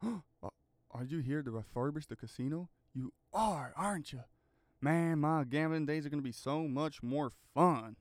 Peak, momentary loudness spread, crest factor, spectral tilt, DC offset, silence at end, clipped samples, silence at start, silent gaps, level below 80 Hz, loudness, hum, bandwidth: -14 dBFS; 15 LU; 22 dB; -7 dB/octave; under 0.1%; 0.05 s; under 0.1%; 0 s; none; -66 dBFS; -37 LUFS; none; 15.5 kHz